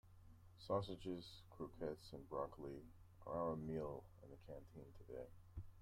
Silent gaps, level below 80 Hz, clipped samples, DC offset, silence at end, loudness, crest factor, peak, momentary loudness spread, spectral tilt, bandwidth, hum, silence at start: none; -66 dBFS; under 0.1%; under 0.1%; 0 s; -50 LUFS; 20 dB; -30 dBFS; 17 LU; -7.5 dB/octave; 16 kHz; none; 0.05 s